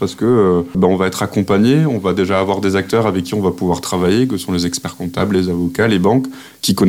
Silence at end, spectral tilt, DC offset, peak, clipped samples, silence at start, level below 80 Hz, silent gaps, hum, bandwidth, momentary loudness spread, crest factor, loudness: 0 s; -6 dB/octave; under 0.1%; -2 dBFS; under 0.1%; 0 s; -46 dBFS; none; none; 16.5 kHz; 6 LU; 14 dB; -16 LUFS